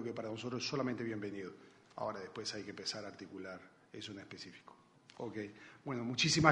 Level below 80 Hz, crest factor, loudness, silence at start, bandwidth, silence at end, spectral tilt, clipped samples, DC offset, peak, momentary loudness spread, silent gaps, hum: -68 dBFS; 28 dB; -41 LUFS; 0 s; 10.5 kHz; 0 s; -4 dB/octave; under 0.1%; under 0.1%; -12 dBFS; 15 LU; none; none